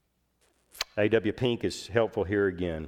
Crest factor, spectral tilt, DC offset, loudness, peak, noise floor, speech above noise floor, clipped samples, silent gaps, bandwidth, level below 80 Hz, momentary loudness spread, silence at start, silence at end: 20 dB; -5.5 dB/octave; under 0.1%; -28 LUFS; -10 dBFS; -71 dBFS; 43 dB; under 0.1%; none; 19 kHz; -54 dBFS; 6 LU; 0.75 s; 0 s